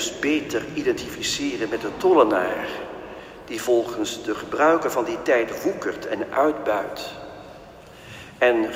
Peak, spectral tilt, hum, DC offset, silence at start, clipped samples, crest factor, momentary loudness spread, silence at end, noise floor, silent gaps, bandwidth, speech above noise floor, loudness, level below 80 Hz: -4 dBFS; -3.5 dB/octave; none; under 0.1%; 0 s; under 0.1%; 20 dB; 20 LU; 0 s; -44 dBFS; none; 16 kHz; 21 dB; -23 LUFS; -54 dBFS